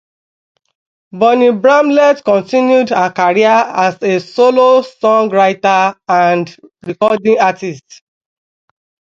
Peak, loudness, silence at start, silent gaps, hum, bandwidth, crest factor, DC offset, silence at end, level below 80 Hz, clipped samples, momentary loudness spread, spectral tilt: 0 dBFS; -11 LUFS; 1.15 s; none; none; 7.6 kHz; 12 dB; under 0.1%; 1.4 s; -62 dBFS; under 0.1%; 7 LU; -5.5 dB/octave